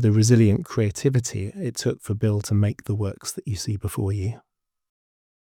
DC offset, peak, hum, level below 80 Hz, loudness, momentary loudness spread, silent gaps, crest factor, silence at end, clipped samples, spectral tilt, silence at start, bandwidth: under 0.1%; -6 dBFS; none; -54 dBFS; -24 LUFS; 12 LU; none; 18 dB; 1.1 s; under 0.1%; -6.5 dB/octave; 0 s; 15.5 kHz